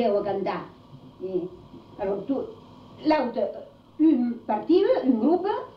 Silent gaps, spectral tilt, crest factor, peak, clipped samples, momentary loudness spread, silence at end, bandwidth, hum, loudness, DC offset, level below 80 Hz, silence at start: none; -8.5 dB/octave; 14 dB; -10 dBFS; under 0.1%; 17 LU; 0.05 s; 5.6 kHz; none; -25 LUFS; under 0.1%; -62 dBFS; 0 s